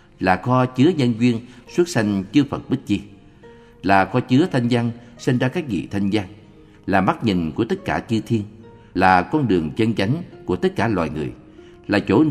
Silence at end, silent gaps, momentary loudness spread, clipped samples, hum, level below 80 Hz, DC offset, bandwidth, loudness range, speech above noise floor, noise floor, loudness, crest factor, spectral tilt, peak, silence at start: 0 s; none; 10 LU; under 0.1%; none; -48 dBFS; under 0.1%; 13.5 kHz; 2 LU; 27 dB; -46 dBFS; -20 LUFS; 20 dB; -7 dB/octave; 0 dBFS; 0.2 s